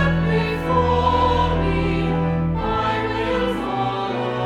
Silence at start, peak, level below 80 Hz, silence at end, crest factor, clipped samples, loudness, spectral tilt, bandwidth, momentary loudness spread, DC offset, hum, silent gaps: 0 s; -6 dBFS; -30 dBFS; 0 s; 14 dB; under 0.1%; -20 LUFS; -7.5 dB/octave; 9.4 kHz; 5 LU; under 0.1%; none; none